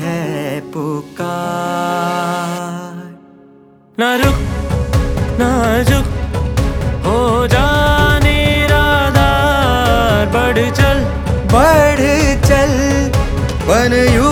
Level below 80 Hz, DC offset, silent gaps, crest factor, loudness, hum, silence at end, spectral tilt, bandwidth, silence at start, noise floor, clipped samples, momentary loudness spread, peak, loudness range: -22 dBFS; under 0.1%; none; 14 dB; -14 LUFS; none; 0 s; -5.5 dB/octave; 18 kHz; 0 s; -44 dBFS; under 0.1%; 10 LU; 0 dBFS; 8 LU